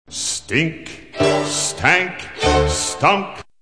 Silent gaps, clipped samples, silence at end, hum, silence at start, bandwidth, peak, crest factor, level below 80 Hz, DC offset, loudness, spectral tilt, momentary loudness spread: none; under 0.1%; 0.2 s; none; 0.1 s; 10.5 kHz; 0 dBFS; 18 dB; -34 dBFS; 0.4%; -18 LUFS; -3 dB/octave; 9 LU